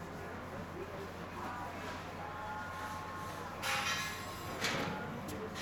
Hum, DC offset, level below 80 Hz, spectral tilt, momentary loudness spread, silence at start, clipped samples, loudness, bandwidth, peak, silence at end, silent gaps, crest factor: none; under 0.1%; -62 dBFS; -3.5 dB/octave; 9 LU; 0 s; under 0.1%; -40 LUFS; over 20 kHz; -22 dBFS; 0 s; none; 20 dB